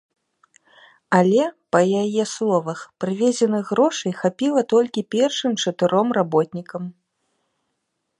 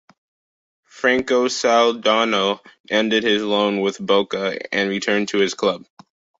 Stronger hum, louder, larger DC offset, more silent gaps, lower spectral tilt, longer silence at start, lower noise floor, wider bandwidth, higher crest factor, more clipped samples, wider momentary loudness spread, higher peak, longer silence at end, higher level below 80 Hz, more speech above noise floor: neither; about the same, -20 LUFS vs -19 LUFS; neither; second, none vs 2.80-2.84 s; first, -5 dB/octave vs -3.5 dB/octave; first, 1.1 s vs 0.95 s; second, -76 dBFS vs under -90 dBFS; first, 11 kHz vs 8 kHz; about the same, 20 dB vs 18 dB; neither; first, 9 LU vs 6 LU; about the same, -2 dBFS vs -2 dBFS; first, 1.3 s vs 0.6 s; second, -72 dBFS vs -62 dBFS; second, 56 dB vs over 71 dB